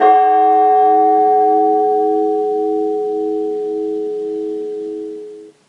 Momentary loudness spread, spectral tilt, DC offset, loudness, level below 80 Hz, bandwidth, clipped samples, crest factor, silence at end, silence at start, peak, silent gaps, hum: 13 LU; -6.5 dB/octave; under 0.1%; -15 LUFS; -84 dBFS; 4.7 kHz; under 0.1%; 14 dB; 0.2 s; 0 s; 0 dBFS; none; none